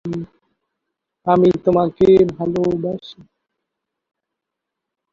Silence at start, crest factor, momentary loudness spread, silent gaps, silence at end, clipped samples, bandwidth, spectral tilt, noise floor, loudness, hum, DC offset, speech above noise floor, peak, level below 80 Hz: 0.05 s; 18 dB; 16 LU; none; 2 s; under 0.1%; 7 kHz; -9 dB/octave; -82 dBFS; -16 LUFS; none; under 0.1%; 66 dB; -2 dBFS; -50 dBFS